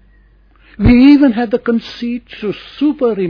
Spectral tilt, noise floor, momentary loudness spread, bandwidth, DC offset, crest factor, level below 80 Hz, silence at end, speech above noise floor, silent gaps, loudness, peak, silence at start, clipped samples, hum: -8.5 dB/octave; -47 dBFS; 16 LU; 5.4 kHz; under 0.1%; 14 dB; -30 dBFS; 0 s; 35 dB; none; -13 LUFS; 0 dBFS; 0.8 s; under 0.1%; none